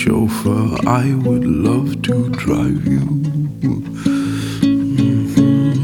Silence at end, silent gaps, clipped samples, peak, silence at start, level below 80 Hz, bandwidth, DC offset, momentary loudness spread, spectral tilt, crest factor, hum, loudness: 0 s; none; under 0.1%; 0 dBFS; 0 s; -38 dBFS; 18.5 kHz; under 0.1%; 5 LU; -7.5 dB/octave; 14 dB; none; -16 LUFS